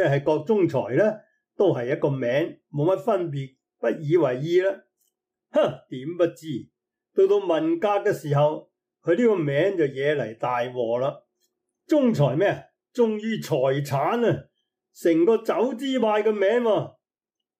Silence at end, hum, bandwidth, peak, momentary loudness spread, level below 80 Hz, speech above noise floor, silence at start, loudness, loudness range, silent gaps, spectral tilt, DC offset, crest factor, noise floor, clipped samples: 0.7 s; none; 15.5 kHz; -10 dBFS; 10 LU; -70 dBFS; 66 dB; 0 s; -23 LUFS; 3 LU; none; -7 dB/octave; under 0.1%; 14 dB; -88 dBFS; under 0.1%